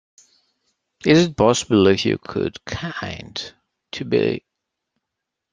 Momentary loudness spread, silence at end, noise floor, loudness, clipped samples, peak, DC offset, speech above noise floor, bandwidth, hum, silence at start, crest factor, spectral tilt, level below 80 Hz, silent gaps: 15 LU; 1.15 s; -82 dBFS; -20 LUFS; under 0.1%; -2 dBFS; under 0.1%; 63 dB; 10 kHz; none; 1.05 s; 20 dB; -5 dB/octave; -52 dBFS; none